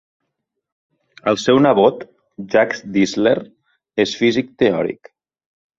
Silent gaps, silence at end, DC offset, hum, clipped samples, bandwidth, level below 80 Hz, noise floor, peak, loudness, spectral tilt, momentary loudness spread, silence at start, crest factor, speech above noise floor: none; 0.85 s; under 0.1%; none; under 0.1%; 7.8 kHz; -58 dBFS; -76 dBFS; -2 dBFS; -17 LUFS; -5.5 dB/octave; 15 LU; 1.25 s; 18 dB; 60 dB